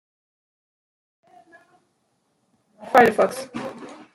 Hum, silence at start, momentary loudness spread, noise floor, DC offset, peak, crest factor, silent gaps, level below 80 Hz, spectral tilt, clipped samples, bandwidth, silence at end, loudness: none; 2.8 s; 20 LU; -70 dBFS; under 0.1%; -2 dBFS; 22 dB; none; -66 dBFS; -4.5 dB/octave; under 0.1%; 16 kHz; 0.2 s; -20 LUFS